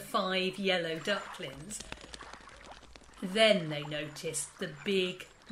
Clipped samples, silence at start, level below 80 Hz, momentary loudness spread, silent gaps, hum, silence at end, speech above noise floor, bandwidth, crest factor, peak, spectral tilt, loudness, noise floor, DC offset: under 0.1%; 0 s; -62 dBFS; 22 LU; none; none; 0 s; 20 dB; 16 kHz; 22 dB; -12 dBFS; -3.5 dB/octave; -32 LUFS; -53 dBFS; under 0.1%